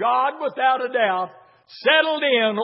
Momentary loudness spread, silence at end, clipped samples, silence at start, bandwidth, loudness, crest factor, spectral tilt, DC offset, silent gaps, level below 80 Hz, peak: 7 LU; 0 s; under 0.1%; 0 s; 5.8 kHz; -20 LUFS; 18 dB; -7.5 dB/octave; under 0.1%; none; -84 dBFS; -4 dBFS